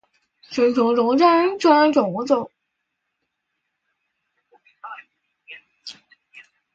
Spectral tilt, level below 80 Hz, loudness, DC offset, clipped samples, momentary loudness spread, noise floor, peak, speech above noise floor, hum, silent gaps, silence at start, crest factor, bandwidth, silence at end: -5.5 dB/octave; -68 dBFS; -18 LUFS; under 0.1%; under 0.1%; 23 LU; -77 dBFS; -4 dBFS; 60 dB; none; none; 0.5 s; 20 dB; 7.8 kHz; 0.35 s